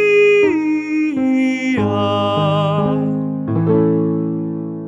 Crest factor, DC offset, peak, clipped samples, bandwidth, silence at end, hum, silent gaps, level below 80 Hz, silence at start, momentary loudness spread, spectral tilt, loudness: 12 dB; under 0.1%; -4 dBFS; under 0.1%; 8 kHz; 0 s; none; none; -56 dBFS; 0 s; 8 LU; -7.5 dB/octave; -16 LUFS